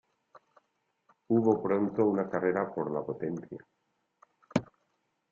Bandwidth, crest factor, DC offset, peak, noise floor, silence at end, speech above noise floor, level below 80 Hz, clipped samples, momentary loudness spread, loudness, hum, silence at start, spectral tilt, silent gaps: 7.6 kHz; 22 dB; under 0.1%; -10 dBFS; -78 dBFS; 0.65 s; 49 dB; -72 dBFS; under 0.1%; 11 LU; -30 LUFS; none; 1.3 s; -8 dB/octave; none